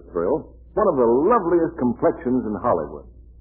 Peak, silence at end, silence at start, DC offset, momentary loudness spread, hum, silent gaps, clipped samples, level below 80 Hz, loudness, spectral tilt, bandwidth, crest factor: -6 dBFS; 0.1 s; 0.1 s; under 0.1%; 9 LU; none; none; under 0.1%; -46 dBFS; -21 LUFS; -13.5 dB/octave; 2.9 kHz; 16 dB